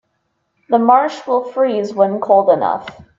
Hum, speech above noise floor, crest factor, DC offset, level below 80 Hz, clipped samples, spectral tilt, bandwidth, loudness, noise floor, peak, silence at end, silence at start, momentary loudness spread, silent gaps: none; 53 dB; 16 dB; under 0.1%; -62 dBFS; under 0.1%; -6.5 dB/octave; 7.6 kHz; -15 LUFS; -68 dBFS; 0 dBFS; 0.15 s; 0.7 s; 7 LU; none